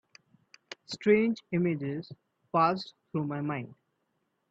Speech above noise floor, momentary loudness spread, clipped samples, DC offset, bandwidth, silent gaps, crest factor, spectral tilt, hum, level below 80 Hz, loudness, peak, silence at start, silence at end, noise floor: 49 dB; 21 LU; under 0.1%; under 0.1%; 8 kHz; none; 20 dB; -7 dB/octave; none; -74 dBFS; -30 LUFS; -12 dBFS; 0.9 s; 0.75 s; -78 dBFS